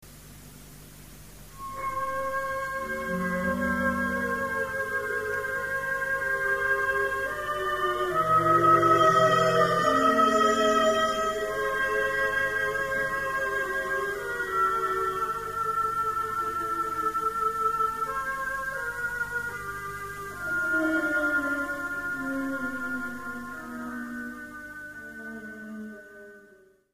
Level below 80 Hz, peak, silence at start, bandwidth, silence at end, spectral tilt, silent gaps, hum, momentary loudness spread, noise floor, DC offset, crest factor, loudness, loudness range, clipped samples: -54 dBFS; -10 dBFS; 0 s; 15.5 kHz; 0.5 s; -4.5 dB/octave; none; 50 Hz at -55 dBFS; 18 LU; -57 dBFS; 0.1%; 18 dB; -26 LUFS; 12 LU; under 0.1%